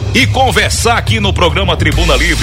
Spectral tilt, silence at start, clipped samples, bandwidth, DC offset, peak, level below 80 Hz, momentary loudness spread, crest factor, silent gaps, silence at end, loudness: -4 dB/octave; 0 s; under 0.1%; 16.5 kHz; under 0.1%; 0 dBFS; -18 dBFS; 2 LU; 10 dB; none; 0 s; -11 LUFS